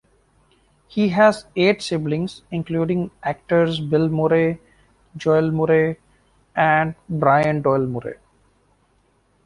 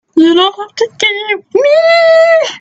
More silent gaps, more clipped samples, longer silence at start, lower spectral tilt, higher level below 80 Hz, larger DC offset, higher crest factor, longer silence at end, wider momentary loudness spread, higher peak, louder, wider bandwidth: neither; neither; first, 0.95 s vs 0.15 s; first, -7 dB/octave vs -2.5 dB/octave; first, -54 dBFS vs -60 dBFS; neither; first, 18 dB vs 10 dB; first, 1.3 s vs 0 s; about the same, 11 LU vs 9 LU; about the same, -2 dBFS vs 0 dBFS; second, -20 LUFS vs -9 LUFS; first, 11 kHz vs 8 kHz